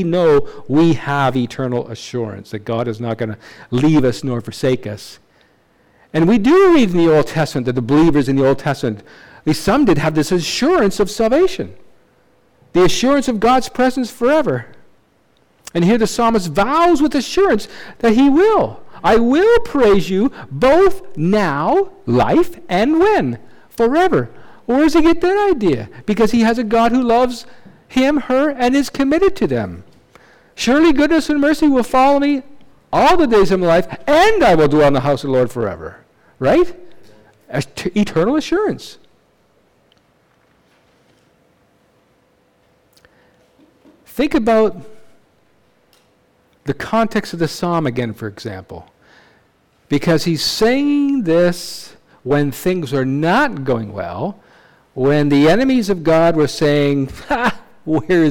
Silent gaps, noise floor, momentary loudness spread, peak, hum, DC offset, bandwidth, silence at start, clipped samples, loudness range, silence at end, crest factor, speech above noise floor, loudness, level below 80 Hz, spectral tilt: none; -57 dBFS; 12 LU; -6 dBFS; none; under 0.1%; 18 kHz; 0 s; under 0.1%; 8 LU; 0 s; 10 dB; 43 dB; -15 LUFS; -38 dBFS; -6 dB/octave